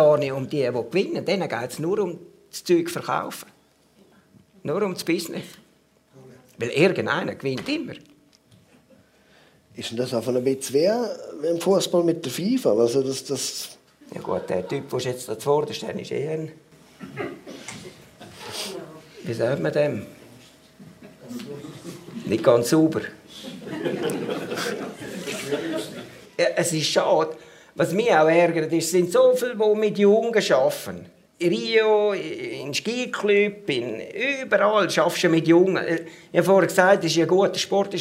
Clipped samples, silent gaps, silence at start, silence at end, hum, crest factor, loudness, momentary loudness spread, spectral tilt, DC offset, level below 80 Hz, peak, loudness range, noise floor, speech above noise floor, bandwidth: under 0.1%; none; 0 s; 0 s; none; 22 dB; -23 LUFS; 19 LU; -4.5 dB/octave; under 0.1%; -68 dBFS; -2 dBFS; 10 LU; -60 dBFS; 38 dB; 16 kHz